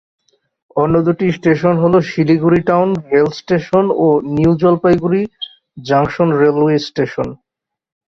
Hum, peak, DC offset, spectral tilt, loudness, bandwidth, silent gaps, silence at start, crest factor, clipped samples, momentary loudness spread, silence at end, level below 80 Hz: none; -2 dBFS; under 0.1%; -8 dB/octave; -14 LUFS; 7 kHz; none; 0.75 s; 14 dB; under 0.1%; 8 LU; 0.75 s; -46 dBFS